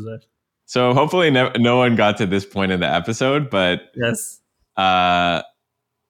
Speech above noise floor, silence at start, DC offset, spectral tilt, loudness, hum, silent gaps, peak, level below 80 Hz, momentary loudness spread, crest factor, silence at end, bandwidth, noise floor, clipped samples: 59 dB; 0 s; under 0.1%; -5 dB/octave; -18 LUFS; none; none; -4 dBFS; -60 dBFS; 10 LU; 16 dB; 0.65 s; 18.5 kHz; -77 dBFS; under 0.1%